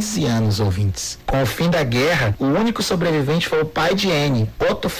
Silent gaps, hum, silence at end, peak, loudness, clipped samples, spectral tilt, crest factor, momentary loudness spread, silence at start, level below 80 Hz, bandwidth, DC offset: none; none; 0 s; -12 dBFS; -19 LUFS; under 0.1%; -5 dB/octave; 6 dB; 3 LU; 0 s; -36 dBFS; 16 kHz; under 0.1%